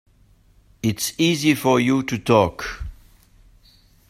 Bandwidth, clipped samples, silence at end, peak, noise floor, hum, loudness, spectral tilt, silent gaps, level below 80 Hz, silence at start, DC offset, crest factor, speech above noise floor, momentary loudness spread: 16 kHz; under 0.1%; 1.15 s; -2 dBFS; -55 dBFS; none; -20 LUFS; -5 dB/octave; none; -44 dBFS; 0.85 s; under 0.1%; 20 dB; 36 dB; 14 LU